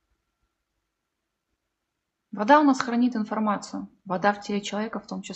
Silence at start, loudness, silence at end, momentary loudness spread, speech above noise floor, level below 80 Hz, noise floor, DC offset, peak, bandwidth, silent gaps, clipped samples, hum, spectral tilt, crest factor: 2.35 s; -24 LUFS; 0 s; 17 LU; 57 dB; -70 dBFS; -81 dBFS; under 0.1%; -4 dBFS; 8.2 kHz; none; under 0.1%; none; -5 dB/octave; 22 dB